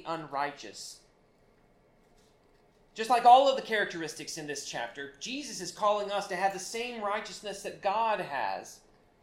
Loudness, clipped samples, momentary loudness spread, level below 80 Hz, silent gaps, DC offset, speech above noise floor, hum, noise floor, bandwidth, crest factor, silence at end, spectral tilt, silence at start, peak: -30 LUFS; under 0.1%; 17 LU; -70 dBFS; none; under 0.1%; 35 dB; none; -64 dBFS; 15.5 kHz; 24 dB; 0.45 s; -2.5 dB/octave; 0 s; -8 dBFS